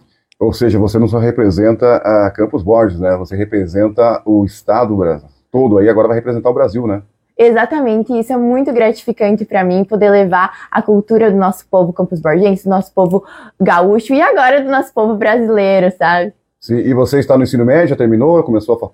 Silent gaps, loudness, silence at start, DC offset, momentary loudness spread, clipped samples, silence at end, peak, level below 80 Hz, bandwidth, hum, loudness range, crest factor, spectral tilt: none; -12 LUFS; 0.4 s; under 0.1%; 6 LU; under 0.1%; 0.05 s; 0 dBFS; -42 dBFS; 16 kHz; none; 2 LU; 12 dB; -8 dB/octave